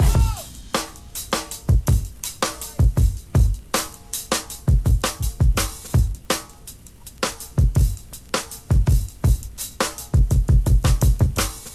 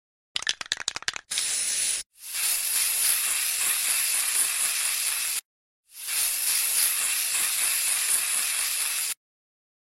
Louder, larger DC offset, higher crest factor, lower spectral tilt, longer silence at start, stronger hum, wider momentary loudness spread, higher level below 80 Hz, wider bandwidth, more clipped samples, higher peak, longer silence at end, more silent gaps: about the same, -22 LUFS vs -23 LUFS; neither; second, 14 dB vs 22 dB; first, -4.5 dB/octave vs 4 dB/octave; second, 0 s vs 0.35 s; neither; first, 11 LU vs 8 LU; first, -22 dBFS vs -70 dBFS; second, 14.5 kHz vs 16.5 kHz; neither; about the same, -6 dBFS vs -4 dBFS; second, 0 s vs 0.65 s; second, none vs 2.06-2.10 s, 5.45-5.83 s